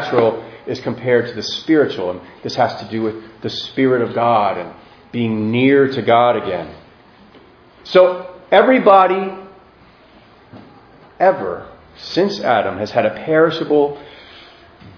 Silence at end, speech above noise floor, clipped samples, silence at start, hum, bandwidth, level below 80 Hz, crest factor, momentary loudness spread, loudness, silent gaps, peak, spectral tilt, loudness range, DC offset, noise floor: 0.05 s; 31 dB; under 0.1%; 0 s; none; 5.4 kHz; -56 dBFS; 18 dB; 15 LU; -16 LUFS; none; 0 dBFS; -6.5 dB/octave; 4 LU; under 0.1%; -47 dBFS